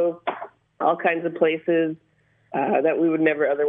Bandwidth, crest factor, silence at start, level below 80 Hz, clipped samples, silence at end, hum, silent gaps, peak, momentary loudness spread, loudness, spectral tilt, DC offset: 3.8 kHz; 16 dB; 0 s; -76 dBFS; under 0.1%; 0 s; none; none; -6 dBFS; 11 LU; -22 LUFS; -9.5 dB/octave; under 0.1%